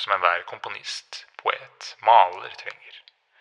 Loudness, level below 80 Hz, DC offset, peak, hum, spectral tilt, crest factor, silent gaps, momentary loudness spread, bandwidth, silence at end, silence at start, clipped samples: -23 LUFS; -84 dBFS; under 0.1%; -2 dBFS; none; -0.5 dB/octave; 22 dB; none; 21 LU; 10.5 kHz; 0.4 s; 0 s; under 0.1%